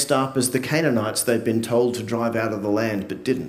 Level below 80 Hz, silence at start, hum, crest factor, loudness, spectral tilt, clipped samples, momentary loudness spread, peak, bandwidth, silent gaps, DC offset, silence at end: -62 dBFS; 0 s; none; 16 dB; -22 LUFS; -4.5 dB/octave; under 0.1%; 4 LU; -6 dBFS; 16 kHz; none; under 0.1%; 0 s